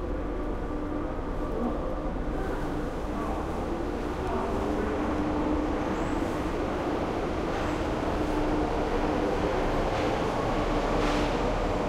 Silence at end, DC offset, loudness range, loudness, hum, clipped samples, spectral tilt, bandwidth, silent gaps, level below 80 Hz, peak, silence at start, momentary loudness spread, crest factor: 0 s; under 0.1%; 4 LU; -30 LUFS; none; under 0.1%; -6.5 dB/octave; 14 kHz; none; -36 dBFS; -14 dBFS; 0 s; 5 LU; 16 dB